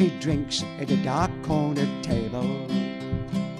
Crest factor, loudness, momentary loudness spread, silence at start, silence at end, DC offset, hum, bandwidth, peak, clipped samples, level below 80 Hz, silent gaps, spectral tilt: 16 dB; -27 LUFS; 5 LU; 0 s; 0 s; under 0.1%; none; 12 kHz; -10 dBFS; under 0.1%; -44 dBFS; none; -6 dB/octave